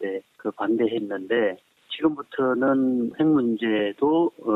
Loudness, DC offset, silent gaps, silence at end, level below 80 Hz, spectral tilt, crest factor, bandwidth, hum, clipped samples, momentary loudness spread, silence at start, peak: -24 LUFS; under 0.1%; none; 0 s; -66 dBFS; -8 dB/octave; 14 dB; 4.1 kHz; none; under 0.1%; 10 LU; 0 s; -8 dBFS